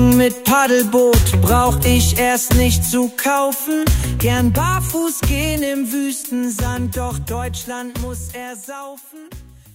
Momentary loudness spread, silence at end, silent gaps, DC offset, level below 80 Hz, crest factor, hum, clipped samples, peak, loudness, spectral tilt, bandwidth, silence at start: 15 LU; 0.3 s; none; under 0.1%; -26 dBFS; 16 dB; none; under 0.1%; 0 dBFS; -17 LUFS; -5 dB/octave; 16.5 kHz; 0 s